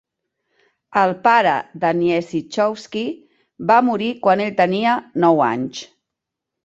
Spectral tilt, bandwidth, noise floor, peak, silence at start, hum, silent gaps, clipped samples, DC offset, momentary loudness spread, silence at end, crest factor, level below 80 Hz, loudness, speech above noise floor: -6 dB/octave; 8 kHz; -82 dBFS; -2 dBFS; 0.9 s; none; none; under 0.1%; under 0.1%; 11 LU; 0.8 s; 18 dB; -64 dBFS; -18 LUFS; 65 dB